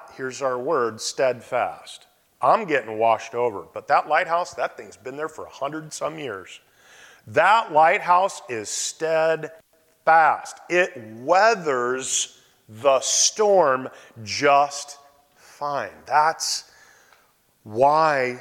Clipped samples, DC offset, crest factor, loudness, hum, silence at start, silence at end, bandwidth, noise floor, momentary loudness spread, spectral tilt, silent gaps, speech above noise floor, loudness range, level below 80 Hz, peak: under 0.1%; under 0.1%; 16 dB; -21 LUFS; none; 0.05 s; 0 s; 16.5 kHz; -61 dBFS; 15 LU; -2 dB/octave; none; 40 dB; 5 LU; -70 dBFS; -6 dBFS